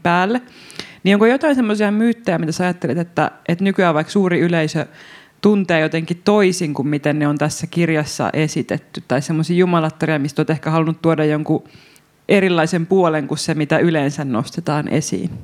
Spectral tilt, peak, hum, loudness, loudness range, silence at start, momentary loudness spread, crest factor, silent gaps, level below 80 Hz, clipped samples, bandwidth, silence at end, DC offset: -6 dB/octave; 0 dBFS; none; -17 LUFS; 1 LU; 0.05 s; 7 LU; 18 dB; none; -56 dBFS; under 0.1%; 15 kHz; 0 s; under 0.1%